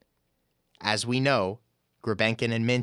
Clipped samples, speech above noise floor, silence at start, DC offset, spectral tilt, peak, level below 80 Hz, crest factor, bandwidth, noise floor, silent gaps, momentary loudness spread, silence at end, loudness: under 0.1%; 49 dB; 0.8 s; under 0.1%; -5 dB/octave; -6 dBFS; -68 dBFS; 22 dB; 13.5 kHz; -74 dBFS; none; 10 LU; 0 s; -27 LUFS